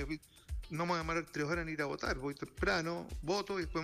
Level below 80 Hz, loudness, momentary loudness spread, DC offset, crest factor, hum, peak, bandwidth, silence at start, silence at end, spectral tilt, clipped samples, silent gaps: -48 dBFS; -37 LUFS; 9 LU; under 0.1%; 14 dB; none; -24 dBFS; 15.5 kHz; 0 s; 0 s; -5 dB/octave; under 0.1%; none